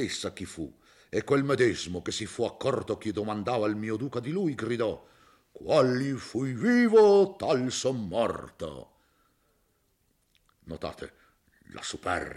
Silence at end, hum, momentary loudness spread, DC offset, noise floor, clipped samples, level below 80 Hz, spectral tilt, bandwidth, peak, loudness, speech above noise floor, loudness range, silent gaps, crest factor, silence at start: 0 s; none; 17 LU; under 0.1%; -71 dBFS; under 0.1%; -62 dBFS; -5.5 dB/octave; 12.5 kHz; -10 dBFS; -28 LUFS; 44 dB; 14 LU; none; 18 dB; 0 s